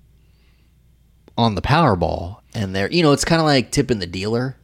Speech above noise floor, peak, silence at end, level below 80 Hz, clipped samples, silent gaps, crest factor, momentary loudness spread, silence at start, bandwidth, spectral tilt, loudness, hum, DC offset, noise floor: 36 dB; -4 dBFS; 0.1 s; -40 dBFS; under 0.1%; none; 16 dB; 12 LU; 1.35 s; 15.5 kHz; -5.5 dB/octave; -19 LUFS; none; under 0.1%; -54 dBFS